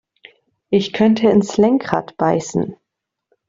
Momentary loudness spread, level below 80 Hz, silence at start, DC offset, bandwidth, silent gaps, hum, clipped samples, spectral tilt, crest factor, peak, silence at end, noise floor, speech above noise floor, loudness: 9 LU; -56 dBFS; 0.7 s; under 0.1%; 7.8 kHz; none; none; under 0.1%; -6 dB/octave; 18 dB; 0 dBFS; 0.75 s; -75 dBFS; 59 dB; -17 LUFS